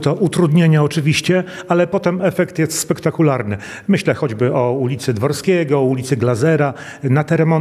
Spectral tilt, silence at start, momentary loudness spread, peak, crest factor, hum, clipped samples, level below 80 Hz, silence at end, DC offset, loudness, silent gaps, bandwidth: -6 dB/octave; 0 s; 5 LU; 0 dBFS; 14 dB; none; under 0.1%; -56 dBFS; 0 s; under 0.1%; -16 LUFS; none; 14.5 kHz